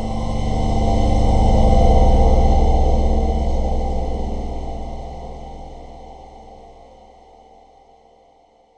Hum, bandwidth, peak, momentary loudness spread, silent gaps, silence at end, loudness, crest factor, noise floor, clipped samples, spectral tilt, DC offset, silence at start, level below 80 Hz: none; 8.4 kHz; -2 dBFS; 23 LU; none; 2.25 s; -19 LUFS; 16 dB; -53 dBFS; under 0.1%; -7.5 dB/octave; under 0.1%; 0 s; -18 dBFS